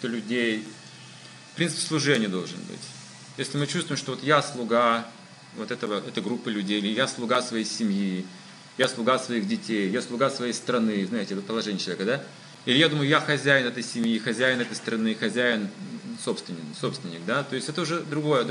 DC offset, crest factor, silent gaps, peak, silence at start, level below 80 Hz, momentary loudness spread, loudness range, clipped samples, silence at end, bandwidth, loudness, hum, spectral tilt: under 0.1%; 22 dB; none; -4 dBFS; 0 s; -84 dBFS; 16 LU; 5 LU; under 0.1%; 0 s; 11.5 kHz; -26 LUFS; none; -4 dB/octave